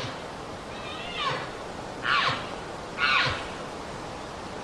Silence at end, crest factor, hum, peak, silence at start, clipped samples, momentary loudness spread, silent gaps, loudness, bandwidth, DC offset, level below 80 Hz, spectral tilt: 0 s; 22 dB; none; -10 dBFS; 0 s; under 0.1%; 14 LU; none; -29 LUFS; 13 kHz; under 0.1%; -52 dBFS; -3.5 dB/octave